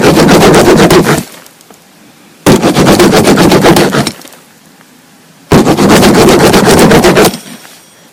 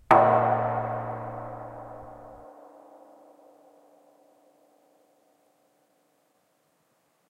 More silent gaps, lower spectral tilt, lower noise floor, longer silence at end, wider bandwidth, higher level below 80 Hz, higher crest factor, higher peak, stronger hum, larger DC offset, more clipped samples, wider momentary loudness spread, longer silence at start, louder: neither; second, -5 dB/octave vs -8 dB/octave; second, -39 dBFS vs -70 dBFS; second, 0.55 s vs 4.85 s; first, over 20 kHz vs 11 kHz; first, -28 dBFS vs -64 dBFS; second, 6 dB vs 28 dB; about the same, 0 dBFS vs -2 dBFS; neither; neither; first, 4% vs under 0.1%; second, 8 LU vs 29 LU; about the same, 0 s vs 0.1 s; first, -5 LUFS vs -26 LUFS